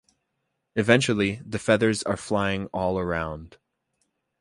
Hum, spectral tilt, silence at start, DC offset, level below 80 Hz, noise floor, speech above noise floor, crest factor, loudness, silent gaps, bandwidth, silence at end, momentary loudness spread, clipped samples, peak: none; -5 dB/octave; 0.75 s; under 0.1%; -50 dBFS; -78 dBFS; 54 dB; 24 dB; -24 LUFS; none; 11.5 kHz; 0.95 s; 10 LU; under 0.1%; -2 dBFS